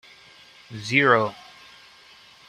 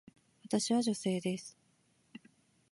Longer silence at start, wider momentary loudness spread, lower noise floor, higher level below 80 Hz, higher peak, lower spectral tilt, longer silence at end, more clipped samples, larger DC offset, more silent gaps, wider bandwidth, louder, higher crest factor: first, 0.7 s vs 0.45 s; about the same, 24 LU vs 25 LU; second, -51 dBFS vs -72 dBFS; first, -66 dBFS vs -80 dBFS; first, -4 dBFS vs -18 dBFS; about the same, -5 dB/octave vs -4.5 dB/octave; first, 1.15 s vs 0.55 s; neither; neither; neither; first, 14 kHz vs 11.5 kHz; first, -20 LUFS vs -34 LUFS; about the same, 24 dB vs 20 dB